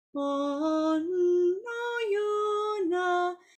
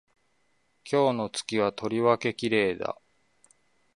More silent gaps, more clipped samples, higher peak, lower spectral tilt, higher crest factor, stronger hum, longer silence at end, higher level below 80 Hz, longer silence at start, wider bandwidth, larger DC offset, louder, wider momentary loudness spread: neither; neither; second, -18 dBFS vs -8 dBFS; second, -3.5 dB/octave vs -5 dB/octave; second, 10 dB vs 20 dB; neither; second, 0.25 s vs 1.05 s; second, -78 dBFS vs -66 dBFS; second, 0.15 s vs 0.85 s; second, 8.8 kHz vs 11.5 kHz; neither; about the same, -28 LUFS vs -27 LUFS; second, 5 LU vs 9 LU